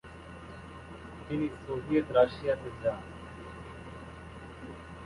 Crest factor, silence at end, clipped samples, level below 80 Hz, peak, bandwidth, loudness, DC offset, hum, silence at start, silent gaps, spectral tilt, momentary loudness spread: 24 dB; 0 s; under 0.1%; -52 dBFS; -10 dBFS; 11.5 kHz; -31 LUFS; under 0.1%; none; 0.05 s; none; -7.5 dB/octave; 20 LU